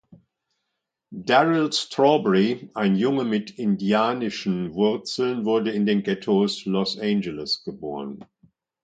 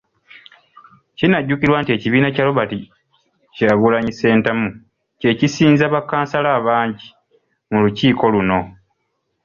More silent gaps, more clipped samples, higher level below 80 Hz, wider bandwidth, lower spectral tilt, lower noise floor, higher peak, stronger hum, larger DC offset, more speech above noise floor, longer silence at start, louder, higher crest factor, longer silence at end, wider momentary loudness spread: neither; neither; second, -64 dBFS vs -50 dBFS; first, 9.2 kHz vs 7.2 kHz; about the same, -5.5 dB/octave vs -6.5 dB/octave; first, -81 dBFS vs -71 dBFS; about the same, -4 dBFS vs -2 dBFS; neither; neither; about the same, 58 dB vs 55 dB; second, 0.1 s vs 1.2 s; second, -23 LUFS vs -16 LUFS; about the same, 20 dB vs 16 dB; second, 0.6 s vs 0.75 s; first, 11 LU vs 8 LU